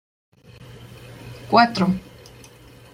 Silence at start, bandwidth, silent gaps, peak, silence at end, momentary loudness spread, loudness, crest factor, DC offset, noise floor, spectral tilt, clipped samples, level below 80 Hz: 0.6 s; 15.5 kHz; none; -2 dBFS; 0.95 s; 26 LU; -19 LUFS; 22 dB; under 0.1%; -46 dBFS; -6 dB/octave; under 0.1%; -54 dBFS